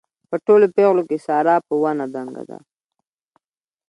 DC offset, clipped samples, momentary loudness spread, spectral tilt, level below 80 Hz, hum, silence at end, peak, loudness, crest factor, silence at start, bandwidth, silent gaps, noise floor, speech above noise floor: under 0.1%; under 0.1%; 17 LU; -8 dB/octave; -72 dBFS; none; 1.35 s; -4 dBFS; -18 LUFS; 16 dB; 0.3 s; 9.8 kHz; none; under -90 dBFS; over 72 dB